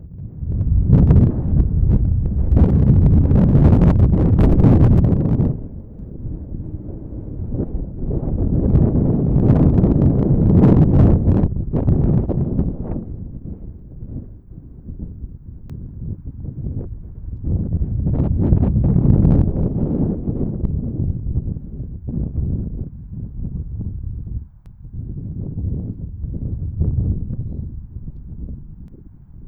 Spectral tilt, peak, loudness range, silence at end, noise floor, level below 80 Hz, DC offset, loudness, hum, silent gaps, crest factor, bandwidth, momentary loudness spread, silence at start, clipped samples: -12.5 dB/octave; 0 dBFS; 15 LU; 0 s; -40 dBFS; -22 dBFS; under 0.1%; -17 LUFS; none; none; 16 dB; 3.3 kHz; 21 LU; 0 s; under 0.1%